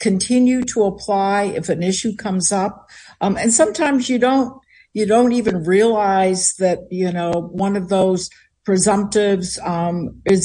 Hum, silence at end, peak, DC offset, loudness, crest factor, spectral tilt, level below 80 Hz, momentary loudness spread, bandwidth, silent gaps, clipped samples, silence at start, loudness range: none; 0 s; -2 dBFS; under 0.1%; -18 LUFS; 16 dB; -4.5 dB/octave; -50 dBFS; 8 LU; 10.5 kHz; none; under 0.1%; 0 s; 2 LU